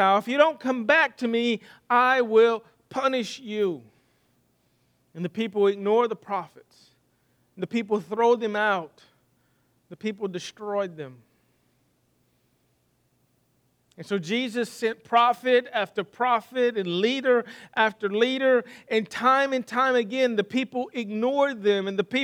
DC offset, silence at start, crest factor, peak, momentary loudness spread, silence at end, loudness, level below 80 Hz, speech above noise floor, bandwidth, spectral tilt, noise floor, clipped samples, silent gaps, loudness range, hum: under 0.1%; 0 s; 20 dB; -6 dBFS; 12 LU; 0 s; -24 LUFS; -78 dBFS; 44 dB; 14 kHz; -5 dB/octave; -68 dBFS; under 0.1%; none; 12 LU; 60 Hz at -60 dBFS